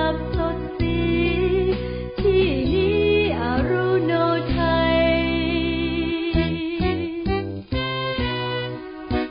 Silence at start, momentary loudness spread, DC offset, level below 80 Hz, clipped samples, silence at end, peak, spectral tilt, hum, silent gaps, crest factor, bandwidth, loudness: 0 s; 8 LU; under 0.1%; -32 dBFS; under 0.1%; 0 s; -8 dBFS; -11.5 dB/octave; none; none; 14 dB; 5.2 kHz; -22 LUFS